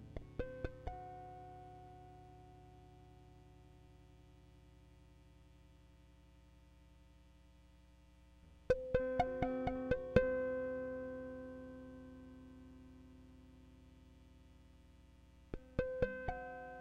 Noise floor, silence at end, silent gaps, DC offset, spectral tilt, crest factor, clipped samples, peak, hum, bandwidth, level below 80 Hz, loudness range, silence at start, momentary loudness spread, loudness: -64 dBFS; 0 s; none; under 0.1%; -8 dB/octave; 30 dB; under 0.1%; -14 dBFS; none; 8.6 kHz; -56 dBFS; 25 LU; 0 s; 27 LU; -41 LUFS